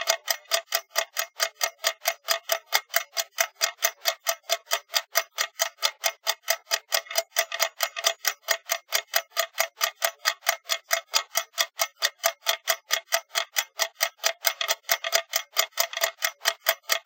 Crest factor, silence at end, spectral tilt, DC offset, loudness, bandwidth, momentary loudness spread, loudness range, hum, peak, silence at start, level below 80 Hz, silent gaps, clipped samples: 26 dB; 0.05 s; 6 dB/octave; under 0.1%; -26 LUFS; 17.5 kHz; 3 LU; 1 LU; none; -2 dBFS; 0 s; under -90 dBFS; none; under 0.1%